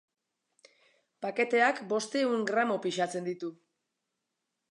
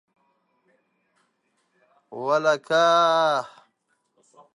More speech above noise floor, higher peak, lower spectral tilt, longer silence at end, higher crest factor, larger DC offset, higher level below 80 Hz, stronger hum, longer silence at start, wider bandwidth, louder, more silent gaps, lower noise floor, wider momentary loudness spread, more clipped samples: first, 55 dB vs 51 dB; second, -12 dBFS vs -6 dBFS; about the same, -4 dB/octave vs -3.5 dB/octave; about the same, 1.15 s vs 1.1 s; about the same, 20 dB vs 18 dB; neither; about the same, -86 dBFS vs -86 dBFS; neither; second, 1.2 s vs 2.1 s; about the same, 11 kHz vs 10.5 kHz; second, -30 LUFS vs -21 LUFS; neither; first, -85 dBFS vs -72 dBFS; second, 13 LU vs 18 LU; neither